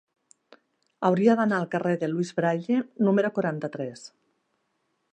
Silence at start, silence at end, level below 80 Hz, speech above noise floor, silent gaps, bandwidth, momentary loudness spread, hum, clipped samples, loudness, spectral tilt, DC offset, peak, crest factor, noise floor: 1 s; 1.05 s; -76 dBFS; 50 dB; none; 9.4 kHz; 12 LU; none; under 0.1%; -25 LUFS; -7.5 dB/octave; under 0.1%; -8 dBFS; 18 dB; -75 dBFS